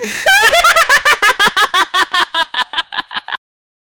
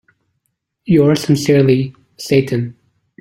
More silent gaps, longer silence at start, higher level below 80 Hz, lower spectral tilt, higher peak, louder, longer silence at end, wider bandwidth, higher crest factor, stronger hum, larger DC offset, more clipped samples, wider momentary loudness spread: neither; second, 0 s vs 0.85 s; first, -44 dBFS vs -50 dBFS; second, 0.5 dB/octave vs -6.5 dB/octave; about the same, 0 dBFS vs 0 dBFS; first, -11 LUFS vs -14 LUFS; first, 0.65 s vs 0.5 s; first, over 20 kHz vs 16 kHz; about the same, 14 dB vs 14 dB; neither; neither; neither; about the same, 14 LU vs 15 LU